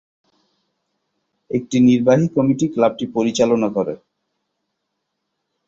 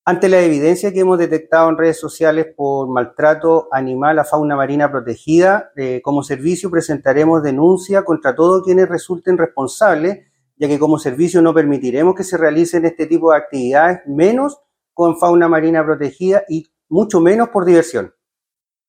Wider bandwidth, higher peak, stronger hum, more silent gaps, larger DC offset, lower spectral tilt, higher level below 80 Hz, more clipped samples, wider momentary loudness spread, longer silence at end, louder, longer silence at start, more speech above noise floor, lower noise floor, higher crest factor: second, 7.8 kHz vs 15 kHz; about the same, -2 dBFS vs 0 dBFS; neither; neither; neither; about the same, -6.5 dB/octave vs -6.5 dB/octave; about the same, -58 dBFS vs -56 dBFS; neither; first, 11 LU vs 7 LU; first, 1.7 s vs 0.8 s; second, -17 LUFS vs -14 LUFS; first, 1.5 s vs 0.05 s; second, 59 dB vs 74 dB; second, -76 dBFS vs -88 dBFS; about the same, 18 dB vs 14 dB